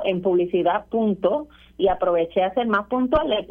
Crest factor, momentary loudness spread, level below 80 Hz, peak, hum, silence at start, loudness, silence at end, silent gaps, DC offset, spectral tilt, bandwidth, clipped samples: 14 dB; 3 LU; -46 dBFS; -6 dBFS; none; 0 s; -22 LUFS; 0.05 s; none; under 0.1%; -8.5 dB/octave; 4.4 kHz; under 0.1%